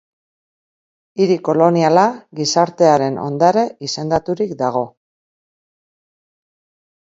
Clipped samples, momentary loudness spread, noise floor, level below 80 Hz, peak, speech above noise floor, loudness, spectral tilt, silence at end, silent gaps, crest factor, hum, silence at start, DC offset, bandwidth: under 0.1%; 9 LU; under -90 dBFS; -56 dBFS; 0 dBFS; over 75 dB; -16 LUFS; -5.5 dB/octave; 2.1 s; none; 18 dB; none; 1.15 s; under 0.1%; 7.8 kHz